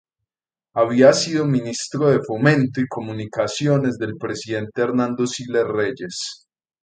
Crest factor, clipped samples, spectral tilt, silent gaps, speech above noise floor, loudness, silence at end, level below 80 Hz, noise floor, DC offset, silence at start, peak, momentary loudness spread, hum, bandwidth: 20 dB; under 0.1%; -5.5 dB/octave; none; over 70 dB; -20 LUFS; 0.45 s; -60 dBFS; under -90 dBFS; under 0.1%; 0.75 s; 0 dBFS; 14 LU; none; 9.4 kHz